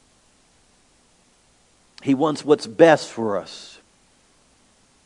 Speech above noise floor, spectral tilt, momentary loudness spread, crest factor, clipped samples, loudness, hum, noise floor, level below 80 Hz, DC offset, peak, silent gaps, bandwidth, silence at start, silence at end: 40 dB; -5.5 dB/octave; 23 LU; 24 dB; under 0.1%; -19 LUFS; none; -59 dBFS; -68 dBFS; under 0.1%; 0 dBFS; none; 11 kHz; 2.05 s; 1.4 s